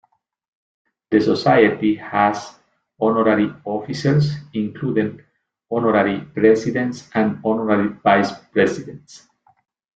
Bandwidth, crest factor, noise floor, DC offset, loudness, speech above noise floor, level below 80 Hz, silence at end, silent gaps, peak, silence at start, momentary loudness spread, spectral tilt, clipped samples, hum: 8 kHz; 18 dB; -60 dBFS; under 0.1%; -19 LUFS; 42 dB; -58 dBFS; 0.8 s; none; -2 dBFS; 1.1 s; 10 LU; -7 dB/octave; under 0.1%; none